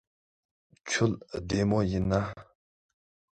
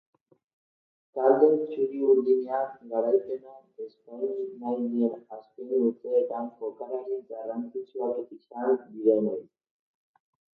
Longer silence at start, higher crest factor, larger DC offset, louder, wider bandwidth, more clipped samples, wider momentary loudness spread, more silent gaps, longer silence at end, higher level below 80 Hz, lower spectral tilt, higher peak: second, 0.85 s vs 1.15 s; about the same, 20 dB vs 20 dB; neither; about the same, -29 LUFS vs -28 LUFS; first, 9.2 kHz vs 4.3 kHz; neither; second, 13 LU vs 16 LU; neither; second, 0.9 s vs 1.1 s; first, -48 dBFS vs -84 dBFS; second, -5.5 dB/octave vs -10.5 dB/octave; second, -12 dBFS vs -8 dBFS